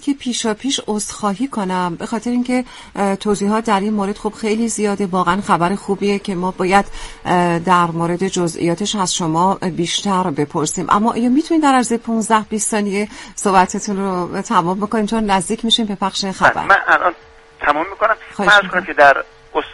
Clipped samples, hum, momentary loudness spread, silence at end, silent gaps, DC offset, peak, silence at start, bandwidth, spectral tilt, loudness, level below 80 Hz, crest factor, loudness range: under 0.1%; none; 9 LU; 0 s; none; under 0.1%; 0 dBFS; 0 s; 11.5 kHz; -4 dB/octave; -17 LUFS; -44 dBFS; 16 dB; 4 LU